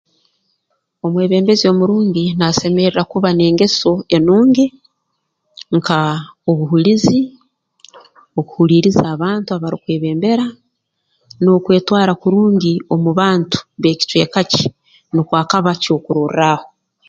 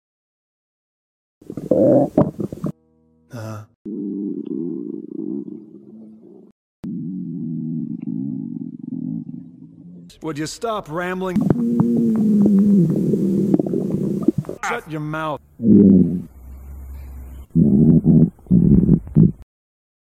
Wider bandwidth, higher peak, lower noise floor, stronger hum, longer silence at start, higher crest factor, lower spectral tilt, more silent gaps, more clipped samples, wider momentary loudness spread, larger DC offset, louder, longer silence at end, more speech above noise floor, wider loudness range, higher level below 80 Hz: second, 7.8 kHz vs 10 kHz; about the same, 0 dBFS vs -2 dBFS; first, -71 dBFS vs -58 dBFS; neither; second, 1.05 s vs 1.5 s; about the same, 14 dB vs 18 dB; second, -6 dB/octave vs -9 dB/octave; second, none vs 3.75-3.85 s, 6.52-6.83 s; neither; second, 8 LU vs 21 LU; neither; first, -14 LUFS vs -18 LUFS; second, 0.4 s vs 0.7 s; first, 57 dB vs 41 dB; second, 3 LU vs 13 LU; second, -50 dBFS vs -40 dBFS